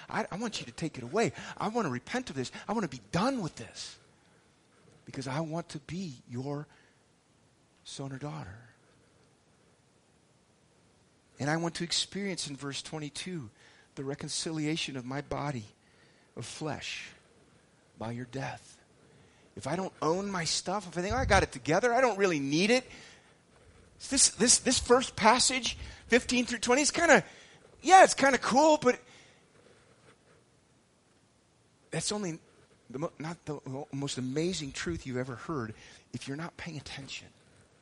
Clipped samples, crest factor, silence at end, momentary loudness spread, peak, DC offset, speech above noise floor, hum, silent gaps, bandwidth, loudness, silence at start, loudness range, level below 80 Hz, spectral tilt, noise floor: under 0.1%; 26 dB; 0.55 s; 19 LU; -6 dBFS; under 0.1%; 36 dB; none; none; 11.5 kHz; -30 LUFS; 0 s; 17 LU; -54 dBFS; -3 dB/octave; -66 dBFS